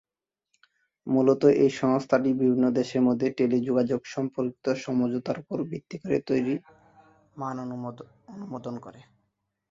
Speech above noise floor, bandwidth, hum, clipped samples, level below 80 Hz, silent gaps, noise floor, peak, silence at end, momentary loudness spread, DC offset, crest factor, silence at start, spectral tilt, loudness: 63 dB; 7.6 kHz; none; under 0.1%; -66 dBFS; none; -89 dBFS; -6 dBFS; 0.7 s; 15 LU; under 0.1%; 20 dB; 1.05 s; -7.5 dB/octave; -26 LUFS